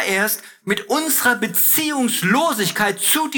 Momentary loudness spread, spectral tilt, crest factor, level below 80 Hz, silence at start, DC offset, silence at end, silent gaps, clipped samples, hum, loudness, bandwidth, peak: 7 LU; -2.5 dB/octave; 16 dB; -66 dBFS; 0 s; under 0.1%; 0 s; none; under 0.1%; none; -17 LUFS; over 20 kHz; -2 dBFS